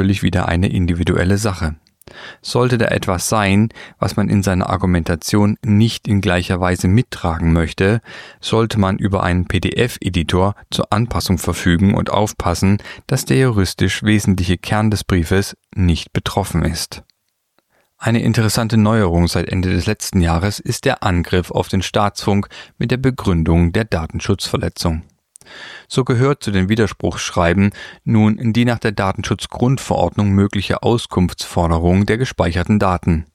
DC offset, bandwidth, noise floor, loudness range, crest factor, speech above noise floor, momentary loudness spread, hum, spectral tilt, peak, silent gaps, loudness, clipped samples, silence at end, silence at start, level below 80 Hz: under 0.1%; 15 kHz; -65 dBFS; 3 LU; 16 dB; 49 dB; 6 LU; none; -6 dB/octave; -2 dBFS; none; -17 LUFS; under 0.1%; 0.1 s; 0 s; -32 dBFS